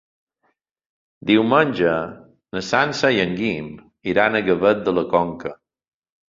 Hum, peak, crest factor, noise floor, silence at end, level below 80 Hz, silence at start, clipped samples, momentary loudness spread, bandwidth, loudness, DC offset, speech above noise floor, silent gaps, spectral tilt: none; -2 dBFS; 20 dB; -70 dBFS; 0.75 s; -54 dBFS; 1.25 s; under 0.1%; 14 LU; 7.6 kHz; -19 LUFS; under 0.1%; 51 dB; none; -5.5 dB/octave